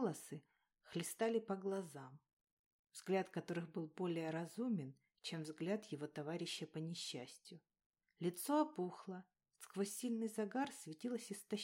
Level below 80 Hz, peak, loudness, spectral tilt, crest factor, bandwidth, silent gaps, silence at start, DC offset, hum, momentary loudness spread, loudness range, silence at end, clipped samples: under -90 dBFS; -26 dBFS; -44 LUFS; -5 dB/octave; 18 dB; 16 kHz; 2.33-2.45 s, 2.52-2.84 s, 7.86-7.90 s; 0 s; under 0.1%; none; 15 LU; 3 LU; 0 s; under 0.1%